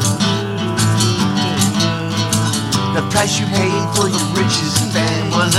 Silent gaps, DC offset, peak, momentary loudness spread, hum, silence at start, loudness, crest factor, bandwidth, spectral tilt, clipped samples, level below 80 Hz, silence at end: none; under 0.1%; -2 dBFS; 2 LU; none; 0 s; -16 LUFS; 14 dB; 16 kHz; -4 dB/octave; under 0.1%; -44 dBFS; 0 s